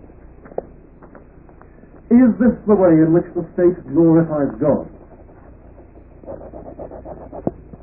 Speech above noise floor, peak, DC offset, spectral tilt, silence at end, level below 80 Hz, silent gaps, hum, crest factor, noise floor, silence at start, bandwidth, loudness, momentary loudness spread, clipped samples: 29 dB; -2 dBFS; 0.1%; -15.5 dB/octave; 0.3 s; -44 dBFS; none; none; 16 dB; -43 dBFS; 0.6 s; 2.7 kHz; -16 LUFS; 22 LU; under 0.1%